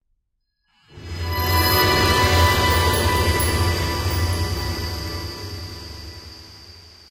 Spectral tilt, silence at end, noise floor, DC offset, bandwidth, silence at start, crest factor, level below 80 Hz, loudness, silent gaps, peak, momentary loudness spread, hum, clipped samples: -4 dB/octave; 0.2 s; -73 dBFS; under 0.1%; 16 kHz; 0.95 s; 16 dB; -30 dBFS; -19 LUFS; none; -4 dBFS; 20 LU; none; under 0.1%